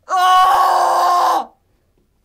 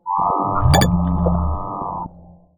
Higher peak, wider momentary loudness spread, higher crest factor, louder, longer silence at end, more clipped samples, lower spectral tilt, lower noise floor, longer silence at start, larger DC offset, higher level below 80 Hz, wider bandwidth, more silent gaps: about the same, -4 dBFS vs -2 dBFS; second, 9 LU vs 13 LU; second, 12 dB vs 18 dB; first, -13 LUFS vs -19 LUFS; first, 0.8 s vs 0.25 s; neither; second, -0.5 dB/octave vs -6 dB/octave; first, -60 dBFS vs -44 dBFS; about the same, 0.1 s vs 0.05 s; neither; second, -56 dBFS vs -26 dBFS; second, 16 kHz vs 19.5 kHz; neither